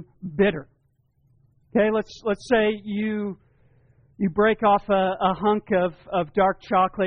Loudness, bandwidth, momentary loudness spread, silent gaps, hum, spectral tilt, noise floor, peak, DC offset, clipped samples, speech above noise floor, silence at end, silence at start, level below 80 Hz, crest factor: -23 LUFS; 7 kHz; 8 LU; none; none; -4.5 dB/octave; -66 dBFS; -8 dBFS; under 0.1%; under 0.1%; 44 dB; 0 s; 0 s; -52 dBFS; 16 dB